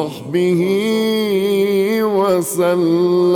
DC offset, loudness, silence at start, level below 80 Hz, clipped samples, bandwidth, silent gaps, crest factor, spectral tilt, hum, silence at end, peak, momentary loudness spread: under 0.1%; -16 LUFS; 0 s; -60 dBFS; under 0.1%; 19 kHz; none; 10 dB; -5.5 dB/octave; none; 0 s; -6 dBFS; 2 LU